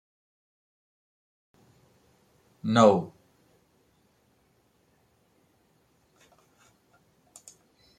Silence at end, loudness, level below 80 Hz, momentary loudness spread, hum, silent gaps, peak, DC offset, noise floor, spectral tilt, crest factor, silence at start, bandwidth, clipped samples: 4.9 s; -23 LUFS; -76 dBFS; 31 LU; none; none; -4 dBFS; under 0.1%; -68 dBFS; -6 dB/octave; 28 dB; 2.65 s; 12 kHz; under 0.1%